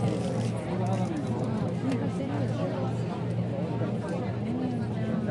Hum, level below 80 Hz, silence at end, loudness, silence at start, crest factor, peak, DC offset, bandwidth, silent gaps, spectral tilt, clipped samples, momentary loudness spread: none; -58 dBFS; 0 s; -30 LUFS; 0 s; 12 dB; -16 dBFS; under 0.1%; 11 kHz; none; -8 dB/octave; under 0.1%; 2 LU